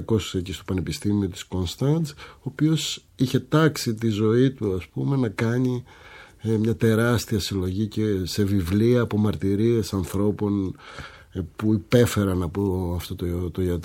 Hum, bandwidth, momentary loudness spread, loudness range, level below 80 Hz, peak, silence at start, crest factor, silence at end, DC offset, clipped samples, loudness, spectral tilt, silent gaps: none; 17 kHz; 9 LU; 2 LU; -46 dBFS; -4 dBFS; 0 s; 20 dB; 0 s; under 0.1%; under 0.1%; -24 LUFS; -6.5 dB/octave; none